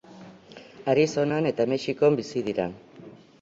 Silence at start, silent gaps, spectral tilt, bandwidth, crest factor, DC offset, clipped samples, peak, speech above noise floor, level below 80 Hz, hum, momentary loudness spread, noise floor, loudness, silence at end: 0.1 s; none; -6 dB/octave; 7.8 kHz; 18 dB; under 0.1%; under 0.1%; -8 dBFS; 24 dB; -64 dBFS; none; 11 LU; -48 dBFS; -25 LUFS; 0.25 s